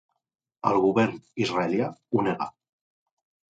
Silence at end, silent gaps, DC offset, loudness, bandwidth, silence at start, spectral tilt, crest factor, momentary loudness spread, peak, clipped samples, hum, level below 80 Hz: 1.1 s; none; under 0.1%; -26 LUFS; 9 kHz; 0.65 s; -6.5 dB/octave; 22 dB; 8 LU; -6 dBFS; under 0.1%; none; -64 dBFS